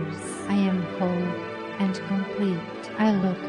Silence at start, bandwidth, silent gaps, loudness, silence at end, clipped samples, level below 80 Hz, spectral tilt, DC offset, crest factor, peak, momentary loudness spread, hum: 0 s; 11.5 kHz; none; -27 LUFS; 0 s; under 0.1%; -62 dBFS; -6.5 dB/octave; under 0.1%; 16 dB; -10 dBFS; 9 LU; none